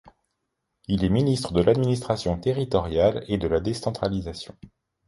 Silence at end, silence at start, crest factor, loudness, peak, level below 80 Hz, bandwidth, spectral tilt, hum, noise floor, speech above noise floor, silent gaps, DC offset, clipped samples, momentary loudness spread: 0.4 s; 0.05 s; 18 dB; -24 LUFS; -6 dBFS; -42 dBFS; 11.5 kHz; -7 dB/octave; none; -79 dBFS; 55 dB; none; under 0.1%; under 0.1%; 10 LU